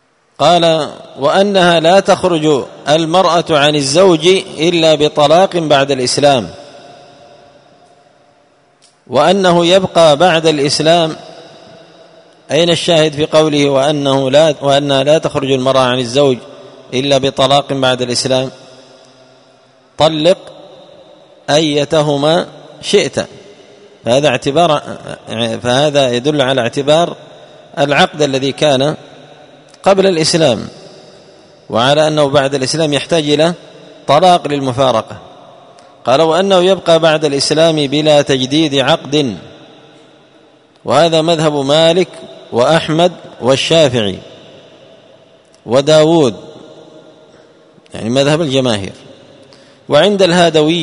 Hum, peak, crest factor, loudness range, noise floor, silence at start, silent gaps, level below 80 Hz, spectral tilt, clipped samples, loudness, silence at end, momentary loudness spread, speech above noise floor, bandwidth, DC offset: none; 0 dBFS; 12 dB; 5 LU; -51 dBFS; 0.4 s; none; -50 dBFS; -4.5 dB/octave; under 0.1%; -11 LUFS; 0 s; 10 LU; 40 dB; 11 kHz; under 0.1%